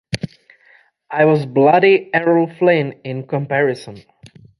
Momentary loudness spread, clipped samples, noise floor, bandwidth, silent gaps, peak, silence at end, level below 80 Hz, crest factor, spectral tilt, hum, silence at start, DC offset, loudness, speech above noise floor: 15 LU; under 0.1%; -52 dBFS; 11.5 kHz; none; 0 dBFS; 0.6 s; -56 dBFS; 16 dB; -7 dB/octave; none; 0.1 s; under 0.1%; -16 LUFS; 37 dB